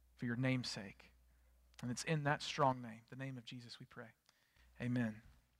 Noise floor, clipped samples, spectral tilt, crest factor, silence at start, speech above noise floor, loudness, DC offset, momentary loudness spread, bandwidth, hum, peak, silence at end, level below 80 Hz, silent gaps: -71 dBFS; under 0.1%; -5.5 dB/octave; 22 dB; 0.2 s; 30 dB; -41 LUFS; under 0.1%; 18 LU; 14 kHz; none; -20 dBFS; 0.25 s; -72 dBFS; none